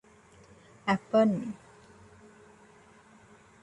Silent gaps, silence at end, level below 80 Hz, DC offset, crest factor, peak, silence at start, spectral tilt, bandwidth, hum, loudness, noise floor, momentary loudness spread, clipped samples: none; 2.1 s; -70 dBFS; under 0.1%; 22 dB; -12 dBFS; 0.85 s; -7 dB/octave; 10.5 kHz; none; -28 LUFS; -57 dBFS; 16 LU; under 0.1%